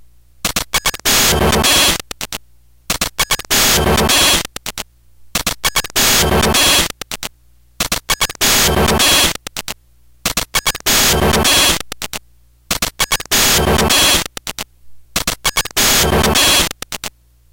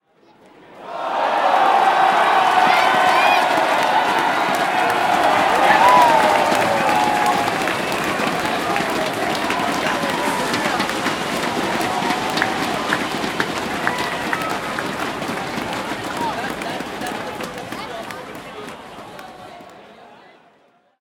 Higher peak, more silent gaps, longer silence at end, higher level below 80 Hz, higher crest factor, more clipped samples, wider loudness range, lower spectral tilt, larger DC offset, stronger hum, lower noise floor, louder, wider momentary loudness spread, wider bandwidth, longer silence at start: about the same, -2 dBFS vs 0 dBFS; neither; second, 0.45 s vs 0.85 s; first, -28 dBFS vs -54 dBFS; second, 14 dB vs 20 dB; neither; second, 2 LU vs 13 LU; second, -1.5 dB/octave vs -3 dB/octave; neither; neither; second, -50 dBFS vs -57 dBFS; first, -12 LUFS vs -18 LUFS; about the same, 16 LU vs 15 LU; about the same, 17.5 kHz vs 18 kHz; second, 0.45 s vs 0.7 s